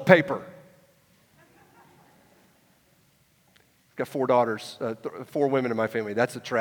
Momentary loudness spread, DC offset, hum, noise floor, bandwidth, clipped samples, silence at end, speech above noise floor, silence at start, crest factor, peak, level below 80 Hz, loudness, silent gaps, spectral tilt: 14 LU; under 0.1%; none; -63 dBFS; 19 kHz; under 0.1%; 0 s; 39 dB; 0 s; 28 dB; 0 dBFS; -74 dBFS; -26 LUFS; none; -6 dB/octave